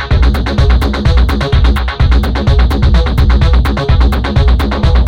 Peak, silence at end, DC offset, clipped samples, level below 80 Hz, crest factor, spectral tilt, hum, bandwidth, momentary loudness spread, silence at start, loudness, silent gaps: 0 dBFS; 0 s; under 0.1%; under 0.1%; -10 dBFS; 8 dB; -7 dB/octave; none; 7 kHz; 2 LU; 0 s; -11 LUFS; none